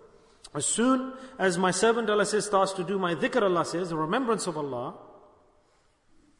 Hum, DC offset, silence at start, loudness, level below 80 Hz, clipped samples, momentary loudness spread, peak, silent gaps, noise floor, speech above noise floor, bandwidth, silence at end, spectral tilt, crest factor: none; under 0.1%; 0.45 s; -26 LUFS; -66 dBFS; under 0.1%; 10 LU; -10 dBFS; none; -65 dBFS; 39 dB; 11 kHz; 1.2 s; -4 dB/octave; 18 dB